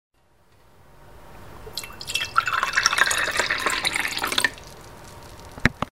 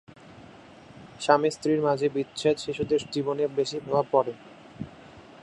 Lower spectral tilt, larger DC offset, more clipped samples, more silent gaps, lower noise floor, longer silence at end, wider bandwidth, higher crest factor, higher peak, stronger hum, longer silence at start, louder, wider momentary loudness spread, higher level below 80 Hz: second, -1.5 dB/octave vs -5.5 dB/octave; first, 0.3% vs under 0.1%; neither; neither; first, -59 dBFS vs -49 dBFS; second, 0.05 s vs 0.2 s; first, 16 kHz vs 11.5 kHz; about the same, 26 dB vs 24 dB; first, 0 dBFS vs -4 dBFS; neither; first, 1.1 s vs 0.25 s; first, -22 LUFS vs -26 LUFS; first, 23 LU vs 19 LU; first, -46 dBFS vs -62 dBFS